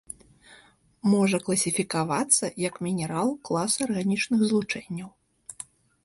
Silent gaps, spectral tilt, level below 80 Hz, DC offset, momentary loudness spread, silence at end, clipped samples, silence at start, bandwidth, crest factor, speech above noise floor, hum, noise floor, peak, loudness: none; -4 dB/octave; -64 dBFS; under 0.1%; 20 LU; 0.4 s; under 0.1%; 0.1 s; 12 kHz; 20 dB; 31 dB; none; -57 dBFS; -6 dBFS; -25 LUFS